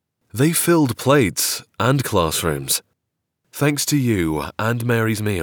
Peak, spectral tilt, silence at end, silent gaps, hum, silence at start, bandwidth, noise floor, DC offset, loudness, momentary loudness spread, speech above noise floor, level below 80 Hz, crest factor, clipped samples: -4 dBFS; -4.5 dB/octave; 0 s; none; none; 0.35 s; over 20 kHz; -78 dBFS; under 0.1%; -19 LUFS; 6 LU; 59 dB; -48 dBFS; 16 dB; under 0.1%